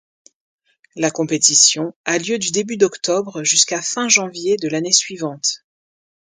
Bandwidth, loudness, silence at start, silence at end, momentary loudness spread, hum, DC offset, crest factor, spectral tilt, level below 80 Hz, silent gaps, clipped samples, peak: 10.5 kHz; -16 LUFS; 0.95 s; 0.65 s; 10 LU; none; under 0.1%; 20 dB; -1.5 dB/octave; -68 dBFS; 1.96-2.04 s; under 0.1%; 0 dBFS